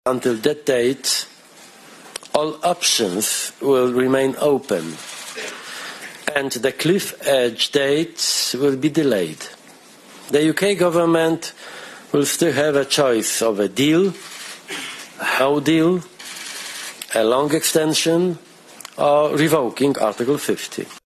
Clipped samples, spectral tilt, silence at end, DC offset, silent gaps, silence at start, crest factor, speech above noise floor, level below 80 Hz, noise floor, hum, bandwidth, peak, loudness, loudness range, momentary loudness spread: under 0.1%; -3.5 dB/octave; 0.1 s; under 0.1%; none; 0.05 s; 18 dB; 27 dB; -62 dBFS; -45 dBFS; none; 14 kHz; -2 dBFS; -19 LUFS; 3 LU; 15 LU